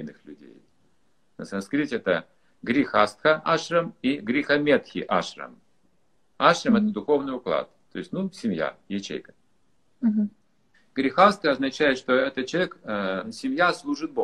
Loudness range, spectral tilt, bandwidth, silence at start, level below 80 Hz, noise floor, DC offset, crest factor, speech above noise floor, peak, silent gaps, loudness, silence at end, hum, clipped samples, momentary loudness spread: 6 LU; -5 dB/octave; 11 kHz; 0 s; -64 dBFS; -70 dBFS; under 0.1%; 24 dB; 46 dB; -2 dBFS; none; -24 LUFS; 0 s; none; under 0.1%; 13 LU